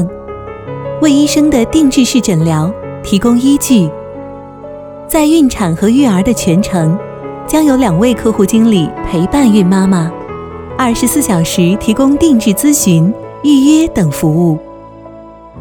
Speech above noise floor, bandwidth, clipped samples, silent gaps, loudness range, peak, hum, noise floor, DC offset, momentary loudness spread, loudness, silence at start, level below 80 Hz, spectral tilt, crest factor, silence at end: 23 dB; 19 kHz; under 0.1%; none; 2 LU; 0 dBFS; none; -33 dBFS; under 0.1%; 16 LU; -10 LUFS; 0 s; -34 dBFS; -5.5 dB/octave; 10 dB; 0 s